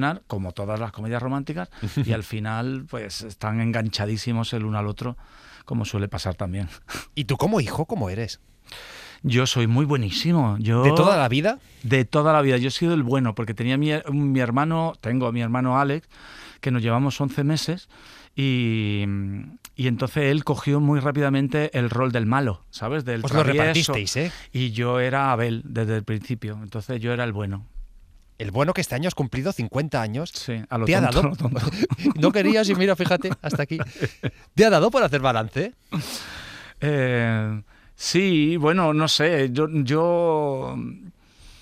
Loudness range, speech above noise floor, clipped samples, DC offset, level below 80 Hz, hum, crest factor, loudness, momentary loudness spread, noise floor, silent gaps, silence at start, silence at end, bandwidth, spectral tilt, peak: 7 LU; 27 dB; under 0.1%; under 0.1%; -48 dBFS; none; 20 dB; -23 LUFS; 13 LU; -49 dBFS; none; 0 s; 0.1 s; 15.5 kHz; -6 dB/octave; -2 dBFS